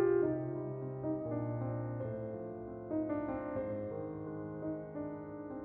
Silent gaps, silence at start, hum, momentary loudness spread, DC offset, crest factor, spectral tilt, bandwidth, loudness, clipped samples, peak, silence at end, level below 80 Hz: none; 0 s; none; 7 LU; under 0.1%; 18 dB; -11 dB/octave; 3.4 kHz; -39 LUFS; under 0.1%; -20 dBFS; 0 s; -64 dBFS